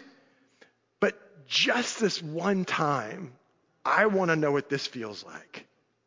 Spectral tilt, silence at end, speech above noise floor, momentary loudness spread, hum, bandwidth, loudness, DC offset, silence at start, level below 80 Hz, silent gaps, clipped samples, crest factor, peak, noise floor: -4 dB/octave; 0.45 s; 35 dB; 19 LU; none; 7.6 kHz; -27 LUFS; under 0.1%; 0 s; -76 dBFS; none; under 0.1%; 20 dB; -8 dBFS; -63 dBFS